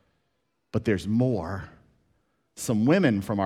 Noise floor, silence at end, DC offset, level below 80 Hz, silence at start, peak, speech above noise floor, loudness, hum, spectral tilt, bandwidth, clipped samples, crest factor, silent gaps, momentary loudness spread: -76 dBFS; 0 s; under 0.1%; -56 dBFS; 0.75 s; -8 dBFS; 52 dB; -25 LUFS; none; -6.5 dB/octave; 15 kHz; under 0.1%; 18 dB; none; 14 LU